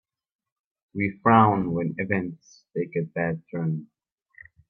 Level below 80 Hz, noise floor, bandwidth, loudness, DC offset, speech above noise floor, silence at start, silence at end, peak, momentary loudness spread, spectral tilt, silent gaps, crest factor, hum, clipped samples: -62 dBFS; -54 dBFS; 6.6 kHz; -25 LUFS; under 0.1%; 30 dB; 0.95 s; 0.85 s; -6 dBFS; 16 LU; -9 dB/octave; none; 20 dB; none; under 0.1%